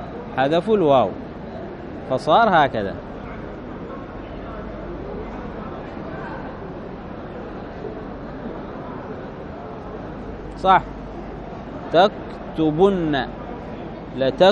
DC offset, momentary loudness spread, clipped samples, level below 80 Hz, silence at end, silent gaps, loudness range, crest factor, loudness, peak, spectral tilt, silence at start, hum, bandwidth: under 0.1%; 16 LU; under 0.1%; -42 dBFS; 0 s; none; 12 LU; 20 dB; -23 LUFS; -2 dBFS; -7 dB/octave; 0 s; none; 9.6 kHz